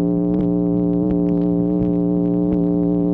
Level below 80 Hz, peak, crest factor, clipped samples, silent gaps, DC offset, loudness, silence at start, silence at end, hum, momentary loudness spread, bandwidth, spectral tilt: -38 dBFS; -6 dBFS; 10 dB; under 0.1%; none; under 0.1%; -18 LUFS; 0 s; 0 s; none; 0 LU; 2.5 kHz; -13.5 dB/octave